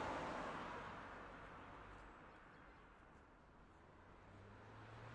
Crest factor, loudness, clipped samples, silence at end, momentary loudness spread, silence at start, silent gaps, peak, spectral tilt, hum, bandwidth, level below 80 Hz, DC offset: 18 dB; -54 LUFS; under 0.1%; 0 s; 18 LU; 0 s; none; -36 dBFS; -5.5 dB/octave; none; 11 kHz; -68 dBFS; under 0.1%